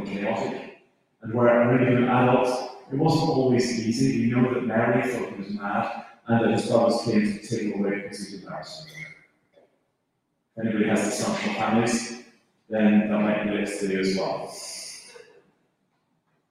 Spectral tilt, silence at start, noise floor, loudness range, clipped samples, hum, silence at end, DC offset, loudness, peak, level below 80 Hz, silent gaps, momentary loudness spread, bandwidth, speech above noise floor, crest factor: -6 dB/octave; 0 s; -75 dBFS; 8 LU; under 0.1%; none; 1.3 s; under 0.1%; -24 LUFS; -6 dBFS; -60 dBFS; none; 17 LU; 12.5 kHz; 52 dB; 18 dB